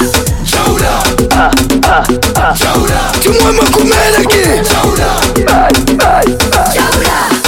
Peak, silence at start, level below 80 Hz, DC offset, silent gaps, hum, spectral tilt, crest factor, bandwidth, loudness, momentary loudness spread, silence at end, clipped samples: 0 dBFS; 0 s; -18 dBFS; under 0.1%; none; none; -3.5 dB/octave; 8 dB; 17 kHz; -8 LUFS; 3 LU; 0 s; under 0.1%